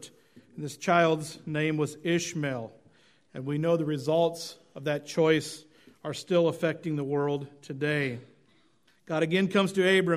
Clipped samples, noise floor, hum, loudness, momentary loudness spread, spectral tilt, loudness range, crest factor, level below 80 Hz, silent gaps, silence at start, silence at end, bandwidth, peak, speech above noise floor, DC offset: under 0.1%; -67 dBFS; none; -28 LUFS; 16 LU; -5.5 dB/octave; 2 LU; 20 dB; -72 dBFS; none; 0 s; 0 s; 15.5 kHz; -8 dBFS; 39 dB; under 0.1%